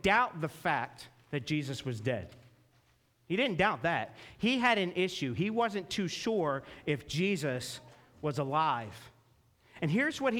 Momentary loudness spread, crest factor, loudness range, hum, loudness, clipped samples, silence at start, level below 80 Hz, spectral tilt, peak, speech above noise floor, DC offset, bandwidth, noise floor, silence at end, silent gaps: 11 LU; 20 dB; 4 LU; none; -32 LUFS; under 0.1%; 0.05 s; -62 dBFS; -5 dB/octave; -14 dBFS; 37 dB; under 0.1%; 18 kHz; -69 dBFS; 0 s; none